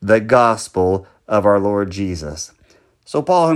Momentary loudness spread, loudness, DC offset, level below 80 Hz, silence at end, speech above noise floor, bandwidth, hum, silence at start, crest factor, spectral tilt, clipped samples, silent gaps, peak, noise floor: 13 LU; -17 LUFS; under 0.1%; -48 dBFS; 0 s; 39 dB; 12 kHz; none; 0 s; 16 dB; -5.5 dB/octave; under 0.1%; none; 0 dBFS; -54 dBFS